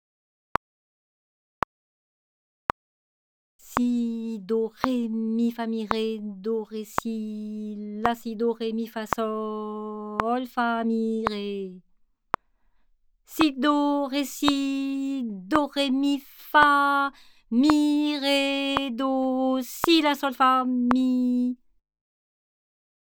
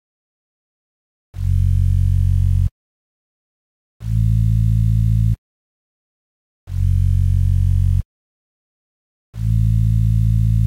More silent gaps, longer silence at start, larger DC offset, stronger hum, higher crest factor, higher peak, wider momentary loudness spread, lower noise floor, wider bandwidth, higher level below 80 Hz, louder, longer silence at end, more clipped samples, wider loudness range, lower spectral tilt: second, none vs 2.71-4.00 s, 5.38-6.67 s, 8.05-9.33 s; first, 3.65 s vs 1.35 s; neither; neither; first, 26 dB vs 10 dB; first, 0 dBFS vs -8 dBFS; first, 12 LU vs 8 LU; second, -63 dBFS vs under -90 dBFS; first, over 20 kHz vs 11 kHz; second, -58 dBFS vs -24 dBFS; second, -25 LUFS vs -18 LUFS; first, 1.5 s vs 0 s; neither; first, 8 LU vs 1 LU; second, -4.5 dB/octave vs -8.5 dB/octave